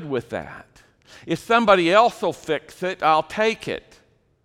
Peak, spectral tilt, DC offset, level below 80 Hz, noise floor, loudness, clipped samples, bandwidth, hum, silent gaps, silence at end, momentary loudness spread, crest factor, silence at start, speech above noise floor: -2 dBFS; -5 dB/octave; under 0.1%; -56 dBFS; -58 dBFS; -20 LUFS; under 0.1%; 15 kHz; none; none; 0.65 s; 16 LU; 20 dB; 0 s; 37 dB